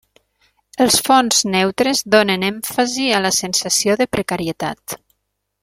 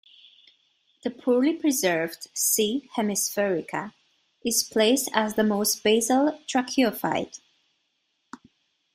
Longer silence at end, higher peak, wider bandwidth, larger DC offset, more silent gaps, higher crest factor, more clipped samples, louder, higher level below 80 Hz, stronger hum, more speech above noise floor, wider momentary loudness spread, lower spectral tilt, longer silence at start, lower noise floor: second, 0.65 s vs 1.6 s; first, 0 dBFS vs -4 dBFS; about the same, 16.5 kHz vs 16 kHz; neither; neither; about the same, 18 dB vs 22 dB; neither; first, -16 LUFS vs -24 LUFS; first, -52 dBFS vs -68 dBFS; first, 50 Hz at -45 dBFS vs none; first, 56 dB vs 50 dB; about the same, 12 LU vs 11 LU; about the same, -2.5 dB/octave vs -3 dB/octave; second, 0.75 s vs 1.05 s; about the same, -73 dBFS vs -74 dBFS